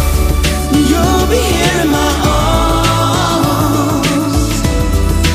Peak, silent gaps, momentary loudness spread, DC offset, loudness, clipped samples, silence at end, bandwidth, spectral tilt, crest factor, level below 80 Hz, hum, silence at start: 0 dBFS; none; 3 LU; 0.5%; -12 LUFS; under 0.1%; 0 s; 15.5 kHz; -5 dB/octave; 10 dB; -18 dBFS; none; 0 s